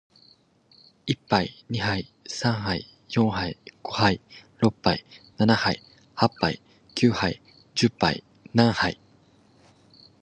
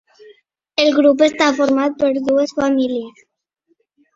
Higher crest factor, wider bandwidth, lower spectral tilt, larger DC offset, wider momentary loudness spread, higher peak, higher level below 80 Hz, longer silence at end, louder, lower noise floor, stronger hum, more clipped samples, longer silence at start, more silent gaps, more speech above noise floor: first, 24 dB vs 16 dB; first, 9.4 kHz vs 7.8 kHz; first, -5.5 dB/octave vs -3.5 dB/octave; neither; first, 13 LU vs 10 LU; about the same, -2 dBFS vs 0 dBFS; first, -52 dBFS vs -60 dBFS; first, 1.3 s vs 1.05 s; second, -25 LUFS vs -16 LUFS; second, -59 dBFS vs -65 dBFS; neither; neither; first, 1.05 s vs 0.8 s; neither; second, 35 dB vs 50 dB